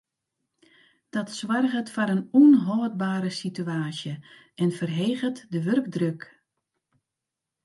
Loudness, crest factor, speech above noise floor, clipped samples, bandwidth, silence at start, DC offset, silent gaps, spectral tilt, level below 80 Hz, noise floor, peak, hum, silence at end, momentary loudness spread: -25 LUFS; 18 dB; 62 dB; under 0.1%; 11.5 kHz; 1.15 s; under 0.1%; none; -6.5 dB/octave; -76 dBFS; -86 dBFS; -8 dBFS; none; 1.45 s; 15 LU